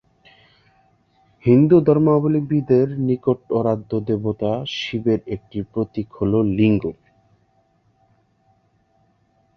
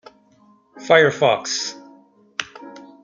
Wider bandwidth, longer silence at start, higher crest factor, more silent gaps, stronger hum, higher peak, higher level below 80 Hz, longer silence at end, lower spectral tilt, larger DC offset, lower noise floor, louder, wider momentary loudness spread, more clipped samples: second, 6.6 kHz vs 9.4 kHz; first, 1.45 s vs 0.75 s; about the same, 18 dB vs 22 dB; neither; neither; about the same, -2 dBFS vs 0 dBFS; first, -50 dBFS vs -66 dBFS; first, 2.65 s vs 0.25 s; first, -9 dB/octave vs -3 dB/octave; neither; first, -62 dBFS vs -55 dBFS; about the same, -19 LUFS vs -19 LUFS; second, 11 LU vs 24 LU; neither